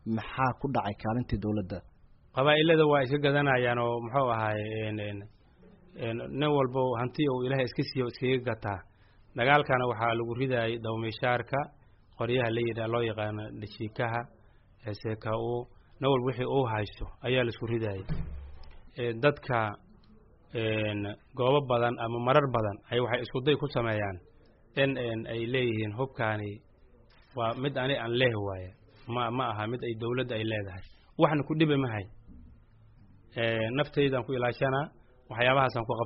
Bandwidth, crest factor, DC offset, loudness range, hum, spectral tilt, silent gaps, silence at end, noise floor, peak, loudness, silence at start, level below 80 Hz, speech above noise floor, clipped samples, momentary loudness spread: 5.8 kHz; 22 dB; under 0.1%; 6 LU; none; -4.5 dB/octave; none; 0 s; -58 dBFS; -8 dBFS; -30 LUFS; 0.05 s; -52 dBFS; 29 dB; under 0.1%; 14 LU